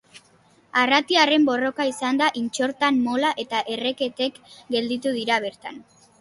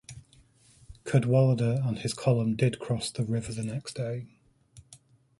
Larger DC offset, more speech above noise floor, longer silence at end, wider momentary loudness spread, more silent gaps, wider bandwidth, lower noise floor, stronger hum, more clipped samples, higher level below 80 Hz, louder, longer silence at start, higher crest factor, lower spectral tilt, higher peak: neither; about the same, 35 dB vs 33 dB; about the same, 0.4 s vs 0.45 s; second, 10 LU vs 13 LU; neither; about the same, 11.5 kHz vs 11.5 kHz; about the same, -57 dBFS vs -60 dBFS; neither; neither; second, -68 dBFS vs -58 dBFS; first, -22 LUFS vs -28 LUFS; about the same, 0.15 s vs 0.1 s; about the same, 20 dB vs 18 dB; second, -3 dB/octave vs -6.5 dB/octave; first, -4 dBFS vs -10 dBFS